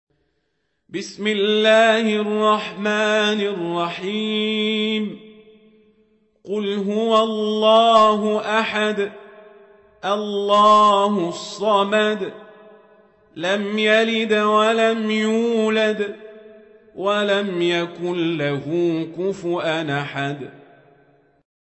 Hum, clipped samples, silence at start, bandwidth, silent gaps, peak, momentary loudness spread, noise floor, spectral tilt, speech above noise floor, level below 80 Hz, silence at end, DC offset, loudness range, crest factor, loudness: none; under 0.1%; 0.95 s; 8.4 kHz; none; -2 dBFS; 12 LU; -72 dBFS; -5 dB/octave; 53 dB; -68 dBFS; 1.1 s; under 0.1%; 5 LU; 18 dB; -19 LUFS